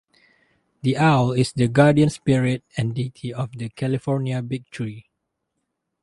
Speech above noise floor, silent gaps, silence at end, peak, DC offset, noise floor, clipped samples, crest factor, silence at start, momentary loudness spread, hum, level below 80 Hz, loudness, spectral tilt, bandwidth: 57 dB; none; 1 s; -2 dBFS; under 0.1%; -77 dBFS; under 0.1%; 20 dB; 0.85 s; 14 LU; none; -54 dBFS; -21 LUFS; -7 dB/octave; 11.5 kHz